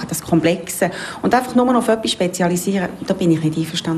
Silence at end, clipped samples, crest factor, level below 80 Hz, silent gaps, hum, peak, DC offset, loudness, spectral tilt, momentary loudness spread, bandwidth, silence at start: 0 s; under 0.1%; 14 dB; -50 dBFS; none; none; -4 dBFS; under 0.1%; -18 LUFS; -5 dB/octave; 6 LU; 15.5 kHz; 0 s